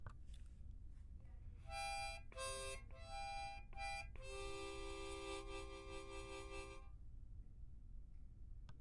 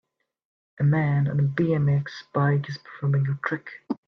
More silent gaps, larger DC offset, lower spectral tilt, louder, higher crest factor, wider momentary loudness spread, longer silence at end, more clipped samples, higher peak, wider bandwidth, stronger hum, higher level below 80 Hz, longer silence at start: neither; neither; second, -3.5 dB/octave vs -9 dB/octave; second, -52 LUFS vs -25 LUFS; about the same, 16 dB vs 14 dB; first, 14 LU vs 8 LU; about the same, 0 s vs 0.1 s; neither; second, -36 dBFS vs -10 dBFS; first, 11.5 kHz vs 6.2 kHz; neither; about the same, -56 dBFS vs -60 dBFS; second, 0 s vs 0.8 s